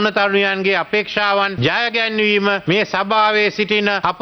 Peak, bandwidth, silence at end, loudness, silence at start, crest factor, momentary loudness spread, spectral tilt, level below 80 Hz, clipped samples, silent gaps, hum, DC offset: -2 dBFS; 6.4 kHz; 0 s; -16 LUFS; 0 s; 16 dB; 2 LU; -5 dB/octave; -56 dBFS; under 0.1%; none; none; under 0.1%